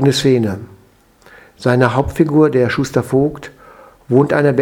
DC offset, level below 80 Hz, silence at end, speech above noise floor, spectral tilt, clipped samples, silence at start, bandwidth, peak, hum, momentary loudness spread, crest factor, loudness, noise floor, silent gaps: under 0.1%; -42 dBFS; 0 s; 36 dB; -6.5 dB/octave; under 0.1%; 0 s; 17 kHz; 0 dBFS; none; 9 LU; 16 dB; -15 LUFS; -50 dBFS; none